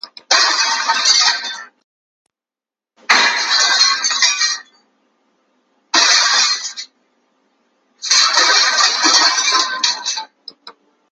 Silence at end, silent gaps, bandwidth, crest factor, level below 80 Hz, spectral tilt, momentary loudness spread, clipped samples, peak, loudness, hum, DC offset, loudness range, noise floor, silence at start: 0.4 s; 1.84-2.25 s; 16 kHz; 16 dB; -76 dBFS; 3.5 dB/octave; 15 LU; under 0.1%; 0 dBFS; -12 LUFS; none; under 0.1%; 3 LU; -90 dBFS; 0.05 s